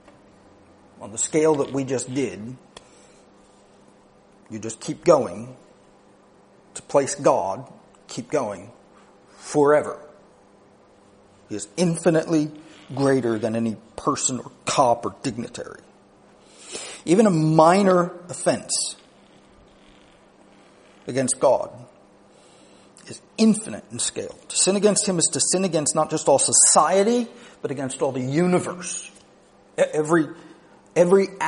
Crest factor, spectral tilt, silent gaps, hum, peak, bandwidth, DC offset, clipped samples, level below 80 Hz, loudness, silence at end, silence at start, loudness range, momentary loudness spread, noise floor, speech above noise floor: 22 dB; -4 dB/octave; none; none; -2 dBFS; 10.5 kHz; under 0.1%; under 0.1%; -64 dBFS; -21 LUFS; 0 s; 1 s; 9 LU; 19 LU; -54 dBFS; 32 dB